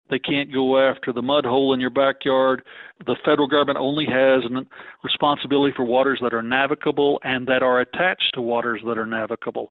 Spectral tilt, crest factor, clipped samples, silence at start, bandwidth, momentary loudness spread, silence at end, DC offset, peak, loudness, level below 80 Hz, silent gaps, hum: -9 dB/octave; 18 dB; under 0.1%; 0.1 s; 4.5 kHz; 8 LU; 0.05 s; under 0.1%; -4 dBFS; -20 LUFS; -62 dBFS; none; none